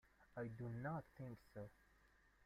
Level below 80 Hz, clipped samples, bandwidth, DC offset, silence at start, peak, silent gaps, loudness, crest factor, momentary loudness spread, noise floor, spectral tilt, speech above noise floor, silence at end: -74 dBFS; under 0.1%; 15 kHz; under 0.1%; 0.05 s; -38 dBFS; none; -53 LUFS; 16 dB; 10 LU; -74 dBFS; -9 dB/octave; 23 dB; 0.15 s